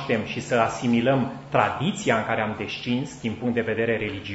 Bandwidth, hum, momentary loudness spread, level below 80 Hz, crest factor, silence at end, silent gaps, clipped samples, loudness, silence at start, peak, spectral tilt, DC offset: 8 kHz; none; 6 LU; -56 dBFS; 20 dB; 0 s; none; under 0.1%; -24 LUFS; 0 s; -4 dBFS; -5.5 dB/octave; under 0.1%